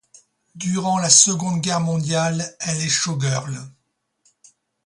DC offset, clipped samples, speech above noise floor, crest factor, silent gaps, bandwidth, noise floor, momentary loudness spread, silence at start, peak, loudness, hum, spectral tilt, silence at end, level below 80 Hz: under 0.1%; under 0.1%; 52 dB; 22 dB; none; 11.5 kHz; -72 dBFS; 14 LU; 0.55 s; 0 dBFS; -18 LUFS; none; -3 dB/octave; 1.15 s; -60 dBFS